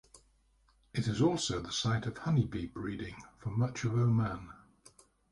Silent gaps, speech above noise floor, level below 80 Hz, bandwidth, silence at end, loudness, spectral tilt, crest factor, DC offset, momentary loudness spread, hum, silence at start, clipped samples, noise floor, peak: none; 37 dB; -56 dBFS; 11.5 kHz; 0.75 s; -33 LUFS; -5.5 dB/octave; 16 dB; under 0.1%; 13 LU; none; 0.15 s; under 0.1%; -69 dBFS; -18 dBFS